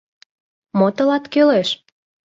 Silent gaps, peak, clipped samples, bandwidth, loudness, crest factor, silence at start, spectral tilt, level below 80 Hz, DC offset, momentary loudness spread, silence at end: none; -4 dBFS; under 0.1%; 7.8 kHz; -17 LUFS; 16 dB; 0.75 s; -6 dB/octave; -64 dBFS; under 0.1%; 10 LU; 0.5 s